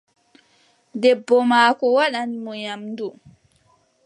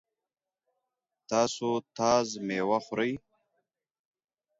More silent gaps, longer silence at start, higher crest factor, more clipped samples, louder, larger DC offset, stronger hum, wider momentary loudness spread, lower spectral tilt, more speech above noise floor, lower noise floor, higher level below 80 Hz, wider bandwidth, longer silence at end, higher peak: neither; second, 0.95 s vs 1.3 s; about the same, 20 dB vs 22 dB; neither; first, -19 LUFS vs -29 LUFS; neither; neither; first, 15 LU vs 6 LU; about the same, -4 dB/octave vs -4 dB/octave; second, 42 dB vs over 61 dB; second, -61 dBFS vs under -90 dBFS; about the same, -72 dBFS vs -68 dBFS; first, 11 kHz vs 8 kHz; second, 0.95 s vs 1.4 s; first, -2 dBFS vs -10 dBFS